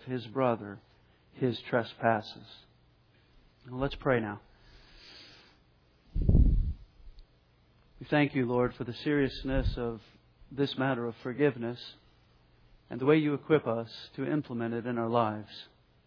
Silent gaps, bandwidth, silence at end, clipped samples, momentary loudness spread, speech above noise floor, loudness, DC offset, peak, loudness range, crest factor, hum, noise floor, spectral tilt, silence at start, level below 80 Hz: none; 5.4 kHz; 0.4 s; under 0.1%; 20 LU; 34 dB; -31 LUFS; under 0.1%; -12 dBFS; 5 LU; 20 dB; none; -65 dBFS; -9 dB/octave; 0.05 s; -38 dBFS